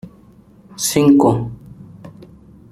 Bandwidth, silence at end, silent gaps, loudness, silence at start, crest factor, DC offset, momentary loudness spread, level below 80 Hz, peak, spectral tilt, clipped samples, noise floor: 15 kHz; 0.6 s; none; -14 LUFS; 0.05 s; 16 dB; under 0.1%; 25 LU; -48 dBFS; -2 dBFS; -5.5 dB/octave; under 0.1%; -46 dBFS